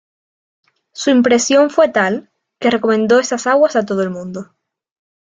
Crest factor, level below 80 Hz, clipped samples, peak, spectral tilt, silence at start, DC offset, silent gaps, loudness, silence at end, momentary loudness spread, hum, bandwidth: 14 dB; -62 dBFS; under 0.1%; -2 dBFS; -4 dB/octave; 0.95 s; under 0.1%; none; -14 LUFS; 0.85 s; 14 LU; none; 9.4 kHz